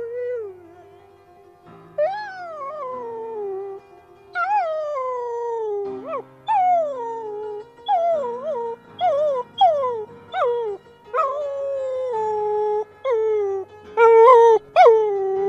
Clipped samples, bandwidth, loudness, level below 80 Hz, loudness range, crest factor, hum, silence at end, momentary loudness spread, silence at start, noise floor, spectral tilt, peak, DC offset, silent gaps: under 0.1%; 7.6 kHz; -20 LUFS; -68 dBFS; 13 LU; 20 dB; none; 0 s; 18 LU; 0 s; -50 dBFS; -4.5 dB/octave; 0 dBFS; under 0.1%; none